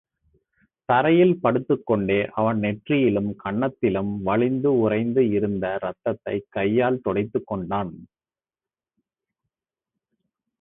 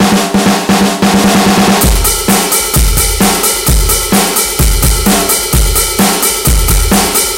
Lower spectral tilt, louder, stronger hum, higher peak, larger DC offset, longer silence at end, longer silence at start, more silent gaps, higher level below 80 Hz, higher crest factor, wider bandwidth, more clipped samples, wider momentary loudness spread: first, -12 dB/octave vs -3.5 dB/octave; second, -23 LUFS vs -9 LUFS; neither; second, -6 dBFS vs 0 dBFS; neither; first, 2.55 s vs 0 s; first, 0.9 s vs 0 s; neither; second, -56 dBFS vs -16 dBFS; first, 18 dB vs 10 dB; second, 4 kHz vs 17.5 kHz; neither; first, 9 LU vs 2 LU